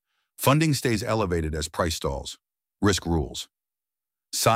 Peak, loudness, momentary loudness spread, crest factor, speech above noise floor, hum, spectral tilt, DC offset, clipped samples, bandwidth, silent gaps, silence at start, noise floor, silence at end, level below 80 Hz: -6 dBFS; -25 LUFS; 14 LU; 20 dB; over 65 dB; none; -4.5 dB/octave; under 0.1%; under 0.1%; 16 kHz; none; 0.4 s; under -90 dBFS; 0 s; -42 dBFS